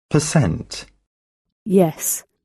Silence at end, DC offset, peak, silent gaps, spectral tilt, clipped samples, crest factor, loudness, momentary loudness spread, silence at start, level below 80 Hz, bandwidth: 0.25 s; under 0.1%; -4 dBFS; 1.07-1.45 s, 1.52-1.66 s; -5.5 dB/octave; under 0.1%; 18 dB; -19 LUFS; 16 LU; 0.1 s; -46 dBFS; 13.5 kHz